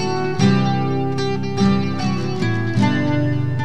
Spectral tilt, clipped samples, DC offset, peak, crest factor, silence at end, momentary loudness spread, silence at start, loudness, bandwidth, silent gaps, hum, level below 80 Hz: -7 dB/octave; under 0.1%; 4%; -4 dBFS; 16 dB; 0 s; 5 LU; 0 s; -19 LUFS; 9.4 kHz; none; none; -50 dBFS